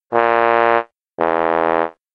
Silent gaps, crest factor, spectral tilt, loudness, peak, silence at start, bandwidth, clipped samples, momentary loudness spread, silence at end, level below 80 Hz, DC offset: none; 16 dB; -7 dB/octave; -16 LUFS; 0 dBFS; 0.1 s; 5.8 kHz; under 0.1%; 7 LU; 0.25 s; -60 dBFS; under 0.1%